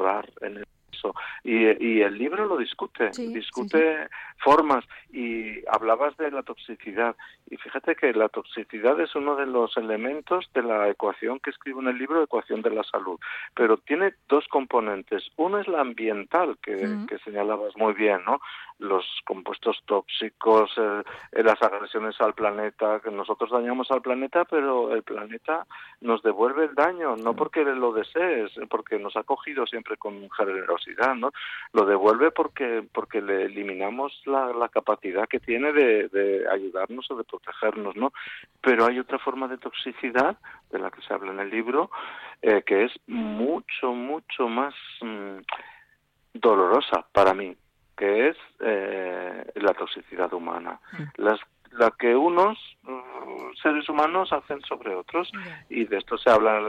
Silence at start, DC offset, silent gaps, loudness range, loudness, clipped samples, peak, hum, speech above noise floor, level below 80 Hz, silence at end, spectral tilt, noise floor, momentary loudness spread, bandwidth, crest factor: 0 s; under 0.1%; none; 3 LU; -25 LUFS; under 0.1%; -8 dBFS; none; 40 dB; -66 dBFS; 0 s; -5.5 dB/octave; -65 dBFS; 14 LU; 8.4 kHz; 18 dB